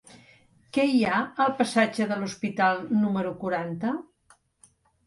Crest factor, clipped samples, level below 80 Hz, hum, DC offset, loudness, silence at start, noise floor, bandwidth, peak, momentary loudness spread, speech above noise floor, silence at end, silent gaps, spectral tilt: 18 dB; under 0.1%; -66 dBFS; none; under 0.1%; -26 LUFS; 0.15 s; -62 dBFS; 11.5 kHz; -8 dBFS; 8 LU; 37 dB; 1.05 s; none; -5.5 dB/octave